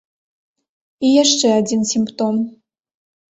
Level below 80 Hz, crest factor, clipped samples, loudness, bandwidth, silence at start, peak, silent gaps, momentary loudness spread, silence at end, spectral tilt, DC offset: -62 dBFS; 16 dB; under 0.1%; -16 LUFS; 8.2 kHz; 1 s; -2 dBFS; none; 9 LU; 0.8 s; -3.5 dB/octave; under 0.1%